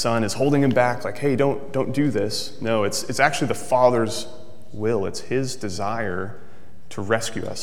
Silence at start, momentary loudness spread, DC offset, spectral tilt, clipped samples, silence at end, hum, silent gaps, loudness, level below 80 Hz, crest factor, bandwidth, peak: 0 s; 11 LU; 3%; -5 dB/octave; under 0.1%; 0 s; none; none; -23 LUFS; -58 dBFS; 22 dB; 17 kHz; -2 dBFS